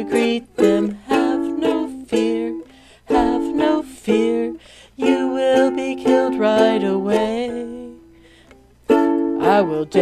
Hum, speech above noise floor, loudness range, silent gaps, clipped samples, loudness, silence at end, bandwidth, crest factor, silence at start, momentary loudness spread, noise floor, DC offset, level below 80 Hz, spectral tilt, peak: none; 32 dB; 2 LU; none; under 0.1%; -19 LUFS; 0 s; 14 kHz; 16 dB; 0 s; 11 LU; -49 dBFS; under 0.1%; -48 dBFS; -5.5 dB/octave; -2 dBFS